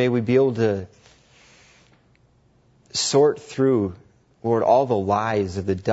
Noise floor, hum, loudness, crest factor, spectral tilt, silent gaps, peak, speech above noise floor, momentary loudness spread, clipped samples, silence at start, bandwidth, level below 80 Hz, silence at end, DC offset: -59 dBFS; none; -21 LUFS; 18 dB; -5.5 dB/octave; none; -4 dBFS; 39 dB; 11 LU; under 0.1%; 0 s; 8 kHz; -58 dBFS; 0 s; under 0.1%